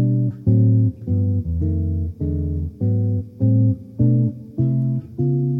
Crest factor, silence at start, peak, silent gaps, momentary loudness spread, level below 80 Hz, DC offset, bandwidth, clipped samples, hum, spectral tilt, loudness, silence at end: 14 dB; 0 s; -6 dBFS; none; 7 LU; -36 dBFS; under 0.1%; 1 kHz; under 0.1%; none; -14 dB/octave; -20 LUFS; 0 s